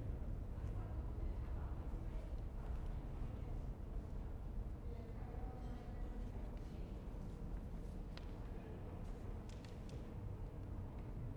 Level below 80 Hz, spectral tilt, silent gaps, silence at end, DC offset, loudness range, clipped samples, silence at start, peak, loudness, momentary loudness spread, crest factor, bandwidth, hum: -48 dBFS; -8 dB/octave; none; 0 s; under 0.1%; 3 LU; under 0.1%; 0 s; -34 dBFS; -50 LUFS; 4 LU; 12 dB; 9.8 kHz; none